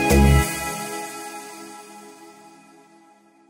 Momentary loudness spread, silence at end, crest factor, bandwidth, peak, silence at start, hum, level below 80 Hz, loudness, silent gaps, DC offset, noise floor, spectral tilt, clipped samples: 27 LU; 1.2 s; 20 dB; 16.5 kHz; -4 dBFS; 0 s; none; -28 dBFS; -21 LUFS; none; under 0.1%; -54 dBFS; -5 dB/octave; under 0.1%